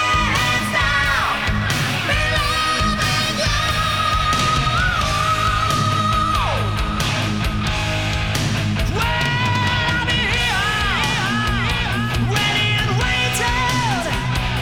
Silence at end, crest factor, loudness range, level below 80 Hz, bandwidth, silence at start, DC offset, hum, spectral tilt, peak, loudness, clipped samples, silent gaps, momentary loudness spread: 0 s; 12 dB; 2 LU; -28 dBFS; over 20 kHz; 0 s; 0.6%; none; -4 dB/octave; -6 dBFS; -18 LUFS; under 0.1%; none; 4 LU